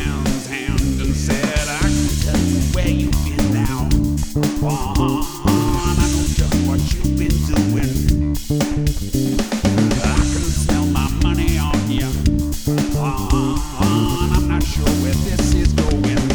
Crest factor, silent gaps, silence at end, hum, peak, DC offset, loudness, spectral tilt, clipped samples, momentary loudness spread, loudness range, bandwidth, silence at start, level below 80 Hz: 16 dB; none; 0 s; none; -2 dBFS; under 0.1%; -19 LUFS; -5.5 dB/octave; under 0.1%; 3 LU; 1 LU; over 20 kHz; 0 s; -22 dBFS